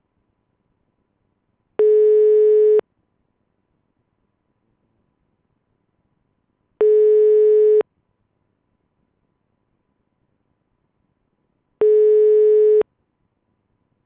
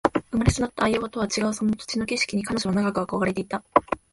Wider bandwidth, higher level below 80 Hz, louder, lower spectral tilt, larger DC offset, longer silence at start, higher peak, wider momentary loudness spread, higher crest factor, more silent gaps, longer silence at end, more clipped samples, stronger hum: second, 3.1 kHz vs 11.5 kHz; second, -76 dBFS vs -42 dBFS; first, -15 LUFS vs -25 LUFS; first, -9 dB/octave vs -5 dB/octave; neither; first, 1.8 s vs 0.05 s; second, -10 dBFS vs 0 dBFS; first, 6 LU vs 3 LU; second, 10 dB vs 24 dB; neither; first, 1.25 s vs 0.15 s; neither; neither